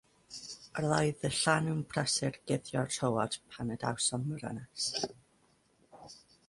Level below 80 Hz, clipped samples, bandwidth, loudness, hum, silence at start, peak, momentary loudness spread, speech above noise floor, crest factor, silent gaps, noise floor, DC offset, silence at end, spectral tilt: -64 dBFS; under 0.1%; 11.5 kHz; -33 LUFS; none; 0.3 s; -12 dBFS; 15 LU; 36 dB; 22 dB; none; -69 dBFS; under 0.1%; 0.3 s; -4 dB/octave